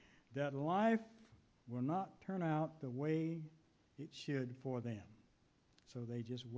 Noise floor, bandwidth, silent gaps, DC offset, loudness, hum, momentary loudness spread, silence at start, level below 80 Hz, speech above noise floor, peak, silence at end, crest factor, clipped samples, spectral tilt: -74 dBFS; 8 kHz; none; under 0.1%; -42 LUFS; none; 15 LU; 0.3 s; -78 dBFS; 33 dB; -24 dBFS; 0 s; 18 dB; under 0.1%; -7.5 dB/octave